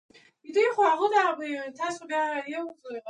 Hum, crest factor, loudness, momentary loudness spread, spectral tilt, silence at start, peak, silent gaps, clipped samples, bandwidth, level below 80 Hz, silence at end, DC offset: none; 18 dB; -27 LUFS; 12 LU; -2.5 dB/octave; 0.45 s; -10 dBFS; none; under 0.1%; 10.5 kHz; -84 dBFS; 0 s; under 0.1%